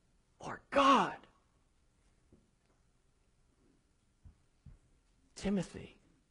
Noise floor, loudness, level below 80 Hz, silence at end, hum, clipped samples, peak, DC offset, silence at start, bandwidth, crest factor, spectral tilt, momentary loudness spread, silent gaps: -73 dBFS; -32 LUFS; -64 dBFS; 0.45 s; none; under 0.1%; -14 dBFS; under 0.1%; 0.4 s; 11 kHz; 24 dB; -5 dB/octave; 25 LU; none